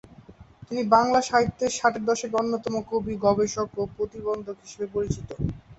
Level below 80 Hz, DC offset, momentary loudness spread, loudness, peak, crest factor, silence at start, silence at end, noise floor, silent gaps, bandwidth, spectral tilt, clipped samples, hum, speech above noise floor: -48 dBFS; under 0.1%; 11 LU; -25 LUFS; -4 dBFS; 20 dB; 0.1 s; 0.05 s; -49 dBFS; none; 8.2 kHz; -5 dB/octave; under 0.1%; none; 24 dB